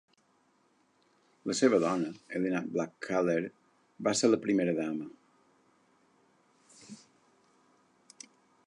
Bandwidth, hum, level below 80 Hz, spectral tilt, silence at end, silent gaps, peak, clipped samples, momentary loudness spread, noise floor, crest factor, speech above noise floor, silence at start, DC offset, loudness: 11 kHz; none; -78 dBFS; -4.5 dB/octave; 1.7 s; none; -12 dBFS; under 0.1%; 25 LU; -70 dBFS; 22 dB; 40 dB; 1.45 s; under 0.1%; -31 LUFS